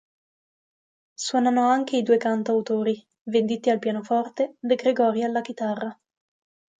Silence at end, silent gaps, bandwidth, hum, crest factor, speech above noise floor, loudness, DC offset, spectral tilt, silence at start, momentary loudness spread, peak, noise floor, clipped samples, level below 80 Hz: 0.85 s; 3.21-3.25 s; 9.2 kHz; none; 16 dB; over 67 dB; -24 LUFS; under 0.1%; -5 dB/octave; 1.2 s; 8 LU; -8 dBFS; under -90 dBFS; under 0.1%; -76 dBFS